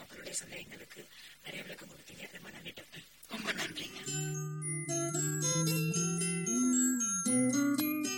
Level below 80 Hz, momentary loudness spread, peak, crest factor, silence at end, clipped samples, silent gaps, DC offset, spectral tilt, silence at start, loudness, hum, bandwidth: -72 dBFS; 20 LU; -20 dBFS; 16 dB; 0 s; under 0.1%; none; under 0.1%; -3.5 dB/octave; 0 s; -32 LUFS; none; 16.5 kHz